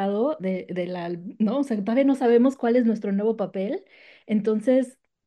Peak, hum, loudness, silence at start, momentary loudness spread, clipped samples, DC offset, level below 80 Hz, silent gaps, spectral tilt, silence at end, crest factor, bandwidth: -10 dBFS; none; -24 LUFS; 0 s; 11 LU; under 0.1%; under 0.1%; -74 dBFS; none; -8 dB/octave; 0.35 s; 14 dB; 10 kHz